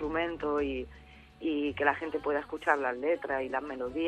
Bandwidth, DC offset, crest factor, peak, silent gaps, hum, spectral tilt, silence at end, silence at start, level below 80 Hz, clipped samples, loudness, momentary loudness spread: 10 kHz; under 0.1%; 22 dB; -10 dBFS; none; none; -6 dB/octave; 0 s; 0 s; -54 dBFS; under 0.1%; -32 LUFS; 7 LU